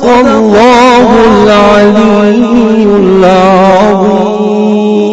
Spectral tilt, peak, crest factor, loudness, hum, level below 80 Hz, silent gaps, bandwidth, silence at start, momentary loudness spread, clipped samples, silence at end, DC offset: -6 dB/octave; 0 dBFS; 4 dB; -5 LUFS; none; -32 dBFS; none; 9 kHz; 0 s; 5 LU; 6%; 0 s; under 0.1%